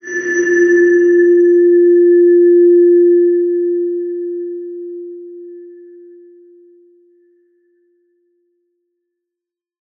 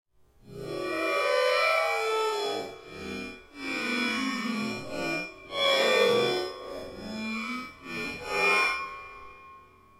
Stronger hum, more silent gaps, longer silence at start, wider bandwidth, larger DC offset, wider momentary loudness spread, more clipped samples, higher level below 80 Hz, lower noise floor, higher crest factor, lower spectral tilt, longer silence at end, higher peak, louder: neither; neither; second, 0.05 s vs 0.45 s; second, 6.4 kHz vs 16.5 kHz; neither; about the same, 19 LU vs 17 LU; neither; second, -82 dBFS vs -62 dBFS; first, -84 dBFS vs -54 dBFS; second, 10 dB vs 18 dB; first, -5 dB/octave vs -3 dB/octave; first, 4.25 s vs 0.35 s; first, -4 dBFS vs -10 dBFS; first, -11 LUFS vs -28 LUFS